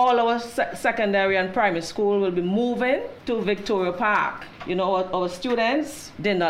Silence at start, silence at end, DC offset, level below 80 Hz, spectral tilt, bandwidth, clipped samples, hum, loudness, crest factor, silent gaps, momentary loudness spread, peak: 0 s; 0 s; under 0.1%; -54 dBFS; -5 dB/octave; 15.5 kHz; under 0.1%; none; -23 LUFS; 14 dB; none; 6 LU; -8 dBFS